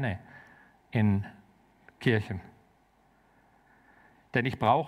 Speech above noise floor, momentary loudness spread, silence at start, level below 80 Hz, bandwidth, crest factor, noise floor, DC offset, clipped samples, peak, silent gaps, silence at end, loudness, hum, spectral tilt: 38 dB; 17 LU; 0 s; -64 dBFS; 10.5 kHz; 20 dB; -65 dBFS; under 0.1%; under 0.1%; -12 dBFS; none; 0 s; -30 LUFS; none; -8 dB/octave